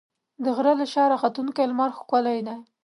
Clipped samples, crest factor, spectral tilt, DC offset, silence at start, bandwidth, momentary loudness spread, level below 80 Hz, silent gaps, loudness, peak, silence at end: under 0.1%; 18 dB; -5.5 dB/octave; under 0.1%; 0.4 s; 11.5 kHz; 8 LU; -80 dBFS; none; -24 LUFS; -6 dBFS; 0.2 s